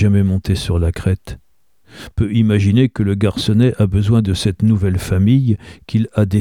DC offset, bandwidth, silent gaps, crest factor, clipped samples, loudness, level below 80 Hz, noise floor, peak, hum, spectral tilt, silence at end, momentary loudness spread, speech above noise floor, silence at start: 0.2%; 13 kHz; none; 14 dB; under 0.1%; -16 LUFS; -32 dBFS; -52 dBFS; -2 dBFS; none; -7.5 dB/octave; 0 s; 7 LU; 37 dB; 0 s